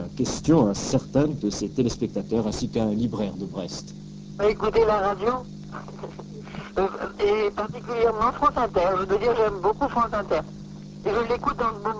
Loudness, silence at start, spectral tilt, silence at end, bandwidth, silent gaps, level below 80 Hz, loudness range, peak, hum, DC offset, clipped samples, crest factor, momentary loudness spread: -24 LUFS; 0 s; -6 dB/octave; 0 s; 8 kHz; none; -44 dBFS; 3 LU; -6 dBFS; none; under 0.1%; under 0.1%; 18 dB; 16 LU